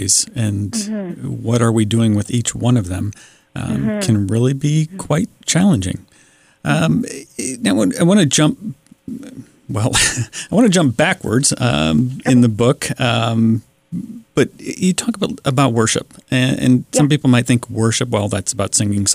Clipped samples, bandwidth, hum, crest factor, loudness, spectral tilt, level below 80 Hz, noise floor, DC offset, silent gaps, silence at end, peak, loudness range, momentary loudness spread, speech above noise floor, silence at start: under 0.1%; 16 kHz; none; 14 dB; -16 LUFS; -4.5 dB/octave; -44 dBFS; -51 dBFS; under 0.1%; none; 0 s; -2 dBFS; 3 LU; 13 LU; 35 dB; 0 s